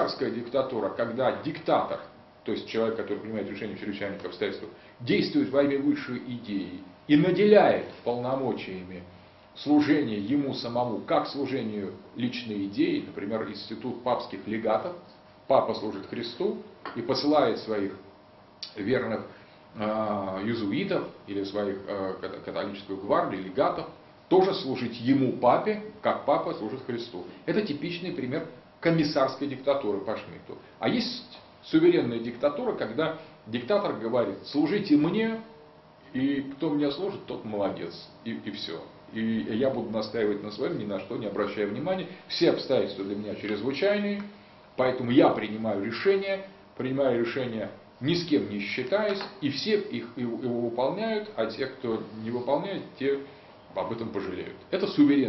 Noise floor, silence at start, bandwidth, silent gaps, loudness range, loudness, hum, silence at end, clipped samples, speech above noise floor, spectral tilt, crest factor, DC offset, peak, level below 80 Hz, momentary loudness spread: -54 dBFS; 0 s; 6 kHz; none; 6 LU; -28 LUFS; none; 0 s; under 0.1%; 26 dB; -7.5 dB/octave; 22 dB; under 0.1%; -6 dBFS; -66 dBFS; 13 LU